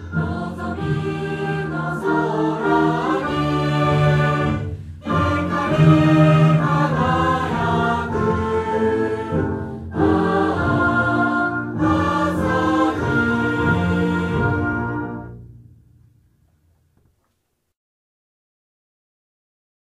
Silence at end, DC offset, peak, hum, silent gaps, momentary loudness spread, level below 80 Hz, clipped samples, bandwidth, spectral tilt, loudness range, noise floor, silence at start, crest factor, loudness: 4.4 s; under 0.1%; -2 dBFS; none; none; 9 LU; -40 dBFS; under 0.1%; 10.5 kHz; -8 dB/octave; 6 LU; -71 dBFS; 0 s; 18 dB; -19 LUFS